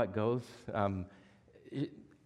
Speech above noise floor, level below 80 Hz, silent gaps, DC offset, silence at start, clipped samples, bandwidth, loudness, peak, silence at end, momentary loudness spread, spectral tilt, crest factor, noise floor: 24 dB; -68 dBFS; none; under 0.1%; 0 s; under 0.1%; 12 kHz; -38 LUFS; -18 dBFS; 0.2 s; 10 LU; -8 dB/octave; 20 dB; -60 dBFS